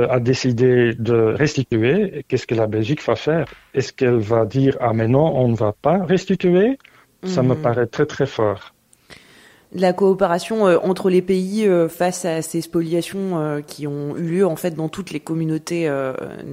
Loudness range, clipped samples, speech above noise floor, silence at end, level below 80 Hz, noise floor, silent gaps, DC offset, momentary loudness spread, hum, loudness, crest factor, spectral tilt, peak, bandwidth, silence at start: 5 LU; under 0.1%; 31 dB; 0 s; -52 dBFS; -49 dBFS; none; under 0.1%; 9 LU; none; -19 LUFS; 16 dB; -6.5 dB/octave; -4 dBFS; 16 kHz; 0 s